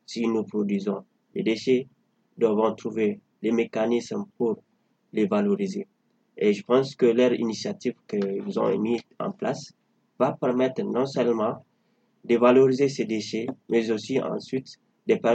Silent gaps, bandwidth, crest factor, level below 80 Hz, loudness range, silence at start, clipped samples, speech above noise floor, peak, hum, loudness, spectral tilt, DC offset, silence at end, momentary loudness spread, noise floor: none; 8.6 kHz; 22 dB; -78 dBFS; 4 LU; 0.1 s; under 0.1%; 44 dB; -4 dBFS; none; -25 LUFS; -6 dB/octave; under 0.1%; 0 s; 12 LU; -68 dBFS